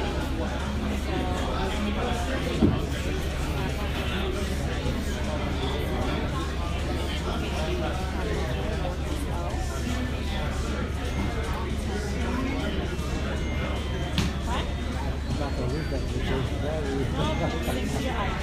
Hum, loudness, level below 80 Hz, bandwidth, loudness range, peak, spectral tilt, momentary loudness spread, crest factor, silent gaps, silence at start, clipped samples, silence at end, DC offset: none; -29 LUFS; -32 dBFS; 15.5 kHz; 2 LU; -8 dBFS; -6 dB/octave; 2 LU; 20 dB; none; 0 s; under 0.1%; 0 s; under 0.1%